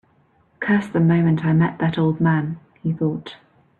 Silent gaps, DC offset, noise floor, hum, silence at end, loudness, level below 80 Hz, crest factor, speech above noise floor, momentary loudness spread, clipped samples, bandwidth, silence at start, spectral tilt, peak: none; under 0.1%; -59 dBFS; none; 0.45 s; -20 LUFS; -56 dBFS; 14 dB; 40 dB; 11 LU; under 0.1%; 4.2 kHz; 0.6 s; -9.5 dB/octave; -6 dBFS